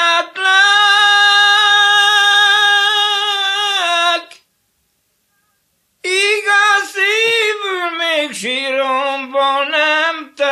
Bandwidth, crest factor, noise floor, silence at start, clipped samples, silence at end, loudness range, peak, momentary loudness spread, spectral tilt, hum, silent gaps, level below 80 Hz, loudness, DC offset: 13.5 kHz; 14 dB; -64 dBFS; 0 s; under 0.1%; 0 s; 7 LU; 0 dBFS; 9 LU; 1 dB/octave; none; none; -76 dBFS; -12 LUFS; under 0.1%